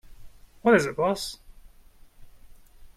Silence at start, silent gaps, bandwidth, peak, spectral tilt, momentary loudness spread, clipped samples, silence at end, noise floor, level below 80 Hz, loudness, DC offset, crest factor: 0.1 s; none; 15.5 kHz; -8 dBFS; -5 dB/octave; 15 LU; under 0.1%; 0.1 s; -52 dBFS; -52 dBFS; -24 LUFS; under 0.1%; 22 dB